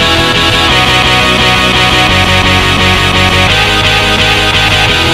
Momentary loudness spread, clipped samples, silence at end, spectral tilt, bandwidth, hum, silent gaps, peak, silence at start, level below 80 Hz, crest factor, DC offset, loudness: 1 LU; 0.4%; 0 s; -3.5 dB/octave; 16.5 kHz; none; none; 0 dBFS; 0 s; -22 dBFS; 8 dB; 0.7%; -6 LUFS